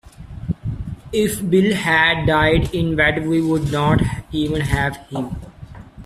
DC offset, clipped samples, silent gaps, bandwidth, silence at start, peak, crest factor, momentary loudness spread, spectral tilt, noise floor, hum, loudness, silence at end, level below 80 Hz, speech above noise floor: under 0.1%; under 0.1%; none; 15.5 kHz; 0.05 s; -2 dBFS; 16 dB; 14 LU; -6 dB/octave; -38 dBFS; none; -18 LUFS; 0 s; -34 dBFS; 20 dB